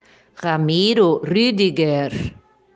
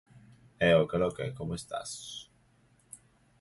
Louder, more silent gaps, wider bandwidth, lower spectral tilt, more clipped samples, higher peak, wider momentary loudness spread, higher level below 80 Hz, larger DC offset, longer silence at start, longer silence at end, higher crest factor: first, -18 LUFS vs -30 LUFS; neither; second, 9.4 kHz vs 11.5 kHz; first, -6.5 dB/octave vs -5 dB/octave; neither; first, -4 dBFS vs -12 dBFS; second, 12 LU vs 26 LU; first, -50 dBFS vs -58 dBFS; neither; first, 0.4 s vs 0.15 s; about the same, 0.45 s vs 0.45 s; second, 14 dB vs 20 dB